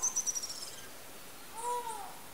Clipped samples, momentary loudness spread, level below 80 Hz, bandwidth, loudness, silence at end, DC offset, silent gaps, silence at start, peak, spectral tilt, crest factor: under 0.1%; 16 LU; -72 dBFS; 16 kHz; -38 LUFS; 0 s; 0.3%; none; 0 s; -22 dBFS; 0.5 dB/octave; 18 dB